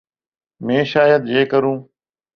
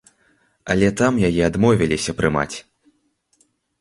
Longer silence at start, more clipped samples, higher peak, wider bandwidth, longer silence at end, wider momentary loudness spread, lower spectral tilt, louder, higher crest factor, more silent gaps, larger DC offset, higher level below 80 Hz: about the same, 0.6 s vs 0.65 s; neither; about the same, -2 dBFS vs -2 dBFS; second, 6.4 kHz vs 11.5 kHz; second, 0.5 s vs 1.2 s; about the same, 12 LU vs 10 LU; first, -7.5 dB/octave vs -5.5 dB/octave; first, -16 LUFS vs -19 LUFS; about the same, 16 dB vs 20 dB; neither; neither; second, -60 dBFS vs -42 dBFS